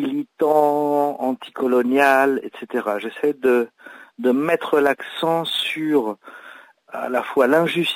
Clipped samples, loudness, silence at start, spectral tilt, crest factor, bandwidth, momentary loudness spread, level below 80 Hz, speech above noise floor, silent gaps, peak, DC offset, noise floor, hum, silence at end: under 0.1%; -20 LUFS; 0 s; -5 dB/octave; 16 dB; 16 kHz; 10 LU; -72 dBFS; 25 dB; none; -4 dBFS; under 0.1%; -44 dBFS; none; 0 s